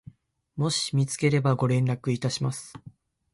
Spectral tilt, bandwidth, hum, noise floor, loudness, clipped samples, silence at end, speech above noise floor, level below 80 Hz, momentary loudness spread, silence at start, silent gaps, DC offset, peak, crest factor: -5.5 dB/octave; 11.5 kHz; none; -51 dBFS; -26 LUFS; under 0.1%; 0.45 s; 26 dB; -60 dBFS; 12 LU; 0.55 s; none; under 0.1%; -10 dBFS; 16 dB